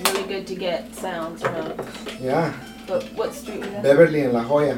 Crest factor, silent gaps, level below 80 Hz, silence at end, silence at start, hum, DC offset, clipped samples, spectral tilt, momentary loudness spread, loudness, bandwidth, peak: 22 dB; none; -52 dBFS; 0 s; 0 s; none; under 0.1%; under 0.1%; -5 dB/octave; 15 LU; -23 LUFS; 18 kHz; 0 dBFS